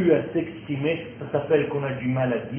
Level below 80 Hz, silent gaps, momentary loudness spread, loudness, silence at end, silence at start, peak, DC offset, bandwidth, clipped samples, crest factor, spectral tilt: -56 dBFS; none; 7 LU; -25 LUFS; 0 s; 0 s; -8 dBFS; under 0.1%; 3.4 kHz; under 0.1%; 16 dB; -11.5 dB/octave